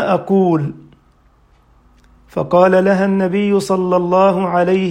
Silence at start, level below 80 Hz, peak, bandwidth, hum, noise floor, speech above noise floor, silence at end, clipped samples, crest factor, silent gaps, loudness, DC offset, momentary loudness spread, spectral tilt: 0 s; -52 dBFS; 0 dBFS; 12.5 kHz; none; -52 dBFS; 38 dB; 0 s; under 0.1%; 14 dB; none; -14 LUFS; under 0.1%; 7 LU; -7.5 dB/octave